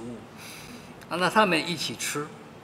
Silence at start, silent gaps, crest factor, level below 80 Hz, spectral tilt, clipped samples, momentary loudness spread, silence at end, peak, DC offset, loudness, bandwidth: 0 s; none; 24 dB; -64 dBFS; -3.5 dB/octave; under 0.1%; 20 LU; 0 s; -6 dBFS; under 0.1%; -26 LUFS; 16 kHz